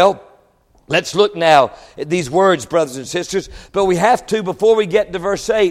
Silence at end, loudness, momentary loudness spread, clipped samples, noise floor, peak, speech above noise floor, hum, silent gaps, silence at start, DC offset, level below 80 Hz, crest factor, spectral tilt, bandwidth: 0 s; -16 LUFS; 10 LU; under 0.1%; -54 dBFS; 0 dBFS; 39 dB; none; none; 0 s; under 0.1%; -46 dBFS; 16 dB; -4.5 dB/octave; 14.5 kHz